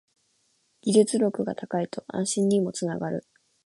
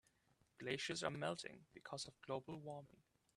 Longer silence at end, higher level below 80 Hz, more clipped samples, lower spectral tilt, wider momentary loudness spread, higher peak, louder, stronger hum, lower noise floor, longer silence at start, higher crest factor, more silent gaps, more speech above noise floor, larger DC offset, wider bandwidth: about the same, 0.45 s vs 0.45 s; first, -70 dBFS vs -80 dBFS; neither; first, -5.5 dB/octave vs -4 dB/octave; about the same, 11 LU vs 12 LU; first, -6 dBFS vs -26 dBFS; first, -26 LUFS vs -48 LUFS; neither; second, -69 dBFS vs -79 dBFS; first, 0.85 s vs 0.6 s; about the same, 20 dB vs 24 dB; neither; first, 44 dB vs 31 dB; neither; second, 11.5 kHz vs 13 kHz